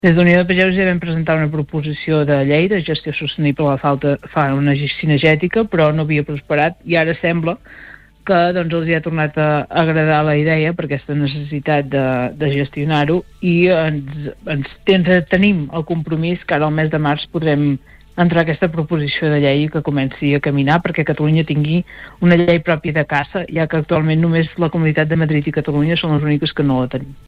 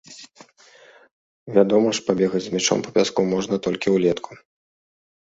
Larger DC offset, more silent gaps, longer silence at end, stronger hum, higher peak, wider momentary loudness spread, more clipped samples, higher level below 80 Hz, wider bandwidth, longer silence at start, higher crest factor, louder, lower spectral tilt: neither; second, none vs 1.11-1.46 s; second, 0.15 s vs 1.05 s; neither; about the same, -2 dBFS vs -2 dBFS; second, 7 LU vs 11 LU; neither; first, -44 dBFS vs -60 dBFS; second, 5 kHz vs 8 kHz; about the same, 0.05 s vs 0.1 s; second, 14 dB vs 20 dB; first, -16 LUFS vs -21 LUFS; first, -9 dB/octave vs -4.5 dB/octave